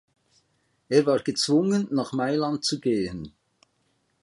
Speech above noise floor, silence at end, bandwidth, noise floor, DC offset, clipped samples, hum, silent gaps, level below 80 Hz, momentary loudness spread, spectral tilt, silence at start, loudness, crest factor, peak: 47 dB; 0.95 s; 11.5 kHz; -70 dBFS; under 0.1%; under 0.1%; none; none; -60 dBFS; 8 LU; -5 dB/octave; 0.9 s; -24 LUFS; 20 dB; -6 dBFS